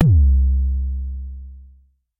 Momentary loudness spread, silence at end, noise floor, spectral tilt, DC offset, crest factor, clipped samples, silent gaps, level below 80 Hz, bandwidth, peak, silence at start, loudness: 22 LU; 0.55 s; -52 dBFS; -10 dB/octave; under 0.1%; 16 dB; under 0.1%; none; -20 dBFS; 0.9 kHz; -2 dBFS; 0 s; -19 LUFS